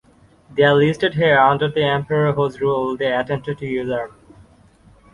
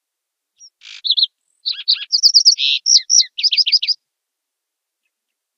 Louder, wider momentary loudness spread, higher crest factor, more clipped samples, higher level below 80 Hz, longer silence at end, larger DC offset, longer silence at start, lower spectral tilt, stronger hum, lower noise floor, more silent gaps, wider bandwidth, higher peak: second, -18 LUFS vs -12 LUFS; about the same, 11 LU vs 13 LU; about the same, 18 dB vs 18 dB; neither; first, -52 dBFS vs under -90 dBFS; second, 1.05 s vs 1.65 s; neither; second, 0.5 s vs 0.85 s; first, -7 dB/octave vs 10.5 dB/octave; neither; second, -50 dBFS vs -80 dBFS; neither; second, 10.5 kHz vs 15.5 kHz; about the same, -2 dBFS vs 0 dBFS